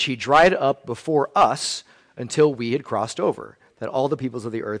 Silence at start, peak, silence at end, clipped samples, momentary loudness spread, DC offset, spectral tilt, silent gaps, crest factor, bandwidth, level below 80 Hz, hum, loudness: 0 s; -6 dBFS; 0 s; under 0.1%; 13 LU; under 0.1%; -4.5 dB/octave; none; 16 dB; 10.5 kHz; -54 dBFS; none; -21 LUFS